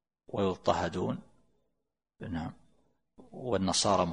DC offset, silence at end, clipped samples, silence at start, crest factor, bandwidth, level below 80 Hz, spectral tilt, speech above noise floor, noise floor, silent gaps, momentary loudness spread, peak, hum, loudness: under 0.1%; 0 s; under 0.1%; 0.3 s; 22 dB; 10.5 kHz; -60 dBFS; -4.5 dB/octave; 54 dB; -85 dBFS; none; 16 LU; -12 dBFS; none; -32 LUFS